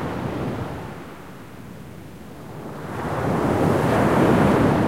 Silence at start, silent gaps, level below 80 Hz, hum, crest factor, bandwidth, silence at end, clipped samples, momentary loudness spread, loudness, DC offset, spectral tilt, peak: 0 s; none; -44 dBFS; none; 16 dB; 16.5 kHz; 0 s; under 0.1%; 22 LU; -21 LUFS; 0.5%; -7.5 dB/octave; -6 dBFS